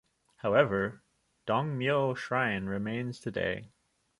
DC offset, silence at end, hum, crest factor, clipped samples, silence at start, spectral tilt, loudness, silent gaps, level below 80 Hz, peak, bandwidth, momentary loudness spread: under 0.1%; 0.5 s; none; 22 dB; under 0.1%; 0.45 s; -7 dB/octave; -31 LUFS; none; -62 dBFS; -8 dBFS; 11.5 kHz; 10 LU